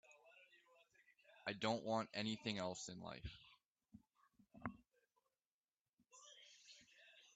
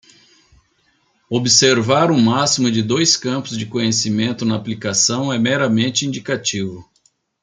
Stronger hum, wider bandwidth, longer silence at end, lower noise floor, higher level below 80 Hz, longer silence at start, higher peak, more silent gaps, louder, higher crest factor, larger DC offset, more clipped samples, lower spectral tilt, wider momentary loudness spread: neither; second, 9 kHz vs 10 kHz; second, 0.1 s vs 0.6 s; first, under -90 dBFS vs -61 dBFS; second, -74 dBFS vs -60 dBFS; second, 0.1 s vs 1.3 s; second, -28 dBFS vs 0 dBFS; first, 3.70-3.75 s, 5.51-5.64 s, 5.81-5.97 s vs none; second, -46 LUFS vs -16 LUFS; first, 24 dB vs 18 dB; neither; neither; about the same, -4 dB/octave vs -3.5 dB/octave; first, 26 LU vs 10 LU